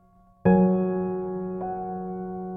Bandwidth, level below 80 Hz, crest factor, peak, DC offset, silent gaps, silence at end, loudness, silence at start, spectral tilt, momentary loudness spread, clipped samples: 2.7 kHz; -54 dBFS; 16 dB; -10 dBFS; under 0.1%; none; 0 s; -26 LUFS; 0.45 s; -13 dB/octave; 13 LU; under 0.1%